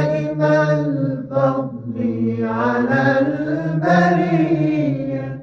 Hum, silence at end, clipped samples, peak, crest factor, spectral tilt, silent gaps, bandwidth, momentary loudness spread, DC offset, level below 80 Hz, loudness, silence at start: none; 0 s; under 0.1%; -2 dBFS; 16 dB; -8.5 dB/octave; none; 7 kHz; 8 LU; under 0.1%; -54 dBFS; -18 LUFS; 0 s